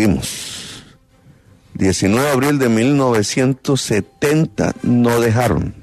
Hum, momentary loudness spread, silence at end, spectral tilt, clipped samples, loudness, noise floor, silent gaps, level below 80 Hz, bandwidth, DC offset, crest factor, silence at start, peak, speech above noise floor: none; 12 LU; 0 s; -5.5 dB/octave; under 0.1%; -16 LUFS; -49 dBFS; none; -40 dBFS; 13.5 kHz; under 0.1%; 14 dB; 0 s; -2 dBFS; 34 dB